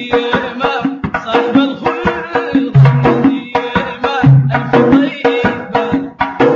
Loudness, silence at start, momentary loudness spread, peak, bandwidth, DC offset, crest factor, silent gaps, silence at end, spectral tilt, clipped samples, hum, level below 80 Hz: -13 LUFS; 0 s; 8 LU; 0 dBFS; 7 kHz; under 0.1%; 12 dB; none; 0 s; -8.5 dB/octave; under 0.1%; none; -40 dBFS